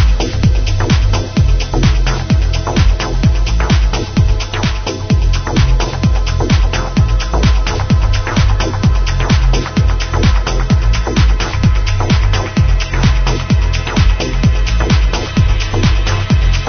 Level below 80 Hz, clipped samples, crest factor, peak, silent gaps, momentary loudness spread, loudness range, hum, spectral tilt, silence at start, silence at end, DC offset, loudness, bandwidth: -14 dBFS; under 0.1%; 12 dB; 0 dBFS; none; 2 LU; 1 LU; none; -5.5 dB/octave; 0 s; 0 s; under 0.1%; -14 LUFS; 6.6 kHz